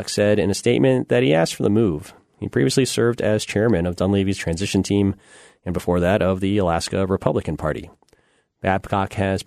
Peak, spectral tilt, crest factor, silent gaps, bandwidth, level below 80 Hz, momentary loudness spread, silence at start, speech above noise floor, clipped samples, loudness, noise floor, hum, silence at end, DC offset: -2 dBFS; -5.5 dB/octave; 18 dB; none; 13.5 kHz; -44 dBFS; 8 LU; 0 s; 41 dB; under 0.1%; -20 LUFS; -60 dBFS; none; 0.05 s; under 0.1%